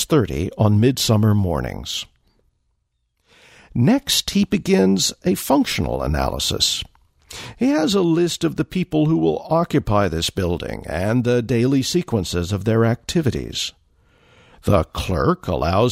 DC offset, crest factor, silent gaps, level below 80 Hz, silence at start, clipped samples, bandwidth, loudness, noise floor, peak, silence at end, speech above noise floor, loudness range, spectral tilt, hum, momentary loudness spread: under 0.1%; 16 dB; none; -38 dBFS; 0 s; under 0.1%; 16 kHz; -19 LUFS; -70 dBFS; -4 dBFS; 0 s; 51 dB; 3 LU; -5 dB/octave; none; 9 LU